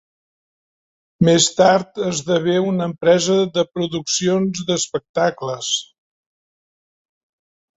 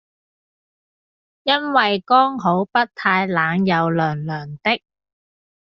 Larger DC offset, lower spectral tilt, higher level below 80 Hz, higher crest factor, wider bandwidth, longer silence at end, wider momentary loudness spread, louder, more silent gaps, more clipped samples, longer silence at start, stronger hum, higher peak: neither; about the same, -4 dB/octave vs -3 dB/octave; first, -56 dBFS vs -62 dBFS; about the same, 18 dB vs 18 dB; first, 8.4 kHz vs 6.4 kHz; first, 1.95 s vs 0.9 s; about the same, 9 LU vs 8 LU; about the same, -18 LUFS vs -19 LUFS; first, 5.09-5.14 s vs none; neither; second, 1.2 s vs 1.45 s; neither; about the same, -2 dBFS vs -2 dBFS